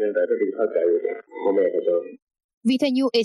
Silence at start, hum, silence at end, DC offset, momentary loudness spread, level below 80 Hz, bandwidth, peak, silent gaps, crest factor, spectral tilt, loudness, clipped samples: 0 s; none; 0 s; under 0.1%; 6 LU; -78 dBFS; 12 kHz; -10 dBFS; 2.22-2.27 s, 2.44-2.61 s; 14 dB; -5.5 dB/octave; -23 LUFS; under 0.1%